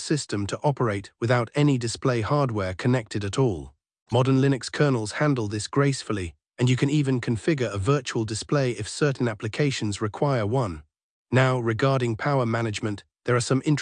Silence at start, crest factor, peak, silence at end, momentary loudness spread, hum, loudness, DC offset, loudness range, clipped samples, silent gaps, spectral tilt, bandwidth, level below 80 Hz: 0 s; 16 dB; -8 dBFS; 0 s; 7 LU; none; -25 LUFS; under 0.1%; 1 LU; under 0.1%; 4.02-4.06 s, 11.03-11.25 s; -6 dB/octave; 10 kHz; -56 dBFS